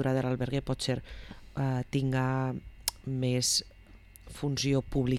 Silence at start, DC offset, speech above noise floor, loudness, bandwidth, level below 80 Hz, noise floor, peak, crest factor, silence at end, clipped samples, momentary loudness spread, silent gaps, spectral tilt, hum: 0 s; under 0.1%; 23 dB; -31 LUFS; 19 kHz; -48 dBFS; -53 dBFS; -14 dBFS; 18 dB; 0 s; under 0.1%; 9 LU; none; -5 dB/octave; none